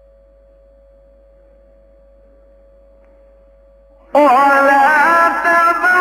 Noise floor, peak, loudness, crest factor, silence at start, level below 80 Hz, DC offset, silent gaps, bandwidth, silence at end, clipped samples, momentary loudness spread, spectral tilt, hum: -47 dBFS; 0 dBFS; -11 LUFS; 14 dB; 4.15 s; -50 dBFS; under 0.1%; none; 16 kHz; 0 s; under 0.1%; 2 LU; -3.5 dB/octave; none